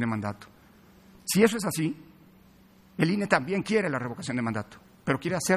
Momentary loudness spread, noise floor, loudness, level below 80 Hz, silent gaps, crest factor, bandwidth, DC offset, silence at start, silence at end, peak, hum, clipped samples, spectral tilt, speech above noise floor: 16 LU; -56 dBFS; -28 LUFS; -62 dBFS; none; 22 dB; 15 kHz; under 0.1%; 0 s; 0 s; -6 dBFS; none; under 0.1%; -5 dB/octave; 30 dB